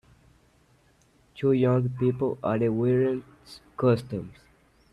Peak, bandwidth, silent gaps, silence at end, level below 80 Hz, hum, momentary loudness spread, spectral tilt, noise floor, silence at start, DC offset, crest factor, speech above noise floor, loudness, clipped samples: -12 dBFS; 11.5 kHz; none; 0.6 s; -60 dBFS; none; 19 LU; -9 dB/octave; -62 dBFS; 1.35 s; under 0.1%; 16 dB; 37 dB; -26 LUFS; under 0.1%